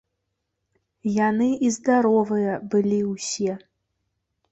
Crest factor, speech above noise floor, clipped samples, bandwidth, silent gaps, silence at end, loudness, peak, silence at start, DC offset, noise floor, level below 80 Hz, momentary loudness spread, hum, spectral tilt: 16 dB; 57 dB; under 0.1%; 8.2 kHz; none; 0.95 s; -22 LUFS; -8 dBFS; 1.05 s; under 0.1%; -78 dBFS; -66 dBFS; 8 LU; none; -5.5 dB/octave